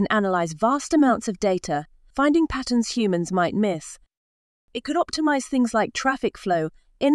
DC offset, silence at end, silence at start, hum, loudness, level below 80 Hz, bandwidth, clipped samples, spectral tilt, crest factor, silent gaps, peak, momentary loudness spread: under 0.1%; 0 s; 0 s; none; -23 LUFS; -50 dBFS; 12 kHz; under 0.1%; -5 dB/octave; 18 dB; 4.17-4.68 s; -4 dBFS; 9 LU